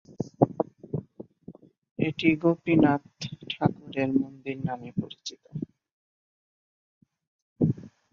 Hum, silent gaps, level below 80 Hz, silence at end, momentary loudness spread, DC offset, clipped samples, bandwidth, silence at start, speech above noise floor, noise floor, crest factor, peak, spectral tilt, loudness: none; 1.78-1.82 s, 1.91-1.96 s, 5.92-7.01 s, 7.27-7.56 s; -60 dBFS; 0.25 s; 16 LU; under 0.1%; under 0.1%; 7.4 kHz; 0.1 s; 24 dB; -50 dBFS; 24 dB; -4 dBFS; -7 dB/octave; -28 LUFS